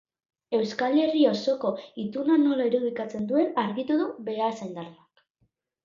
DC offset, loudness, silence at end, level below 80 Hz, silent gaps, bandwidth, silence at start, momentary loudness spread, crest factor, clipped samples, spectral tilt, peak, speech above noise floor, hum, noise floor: under 0.1%; -26 LUFS; 0.9 s; -74 dBFS; none; 7.4 kHz; 0.5 s; 12 LU; 18 dB; under 0.1%; -6.5 dB/octave; -10 dBFS; 47 dB; none; -73 dBFS